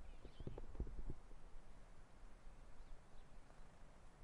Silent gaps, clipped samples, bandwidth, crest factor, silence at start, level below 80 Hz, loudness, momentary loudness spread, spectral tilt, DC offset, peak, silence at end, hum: none; under 0.1%; 10.5 kHz; 18 dB; 0 s; -56 dBFS; -60 LUFS; 13 LU; -6.5 dB/octave; under 0.1%; -34 dBFS; 0 s; none